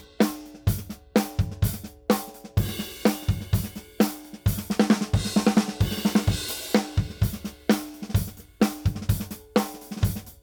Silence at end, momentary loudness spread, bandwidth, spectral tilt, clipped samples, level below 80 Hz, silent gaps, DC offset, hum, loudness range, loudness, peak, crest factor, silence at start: 0.1 s; 7 LU; over 20 kHz; -5.5 dB/octave; under 0.1%; -38 dBFS; none; under 0.1%; none; 3 LU; -26 LUFS; -4 dBFS; 22 dB; 0 s